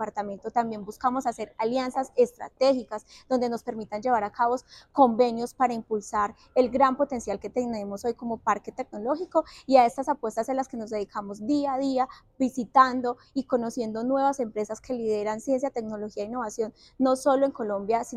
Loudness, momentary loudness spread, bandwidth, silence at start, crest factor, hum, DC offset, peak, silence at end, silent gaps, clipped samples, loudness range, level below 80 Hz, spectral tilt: -27 LUFS; 11 LU; 13.5 kHz; 0 s; 20 dB; none; under 0.1%; -6 dBFS; 0 s; none; under 0.1%; 3 LU; -60 dBFS; -5 dB/octave